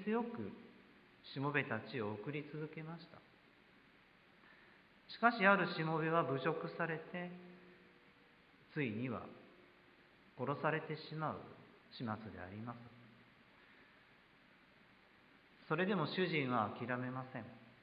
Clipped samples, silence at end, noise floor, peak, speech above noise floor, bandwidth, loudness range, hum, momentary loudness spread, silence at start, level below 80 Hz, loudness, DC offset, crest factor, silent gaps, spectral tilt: under 0.1%; 0.1 s; -67 dBFS; -16 dBFS; 28 dB; 5.2 kHz; 14 LU; none; 21 LU; 0 s; -78 dBFS; -40 LUFS; under 0.1%; 26 dB; none; -4.5 dB/octave